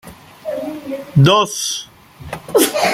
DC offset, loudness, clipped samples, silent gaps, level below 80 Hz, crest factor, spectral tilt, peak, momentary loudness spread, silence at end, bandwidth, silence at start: under 0.1%; -16 LUFS; under 0.1%; none; -50 dBFS; 18 dB; -4.5 dB/octave; 0 dBFS; 19 LU; 0 s; 16 kHz; 0.05 s